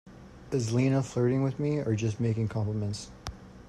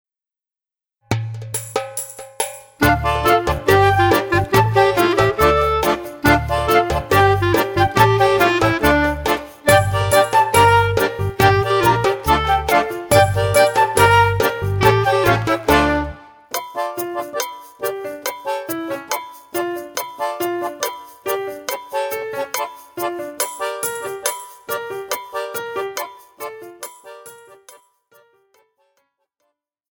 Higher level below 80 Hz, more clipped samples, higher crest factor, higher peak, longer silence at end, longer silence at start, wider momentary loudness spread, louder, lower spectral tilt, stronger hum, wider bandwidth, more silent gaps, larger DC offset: second, -54 dBFS vs -36 dBFS; neither; about the same, 14 dB vs 18 dB; second, -16 dBFS vs 0 dBFS; second, 0 s vs 2.6 s; second, 0.05 s vs 1.1 s; about the same, 12 LU vs 13 LU; second, -29 LUFS vs -18 LUFS; first, -7 dB/octave vs -4.5 dB/octave; neither; second, 11.5 kHz vs over 20 kHz; neither; neither